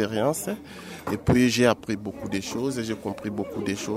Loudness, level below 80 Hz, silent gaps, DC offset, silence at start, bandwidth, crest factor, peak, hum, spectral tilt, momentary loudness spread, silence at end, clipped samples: -26 LUFS; -50 dBFS; none; under 0.1%; 0 s; 16 kHz; 20 dB; -6 dBFS; none; -5 dB/octave; 12 LU; 0 s; under 0.1%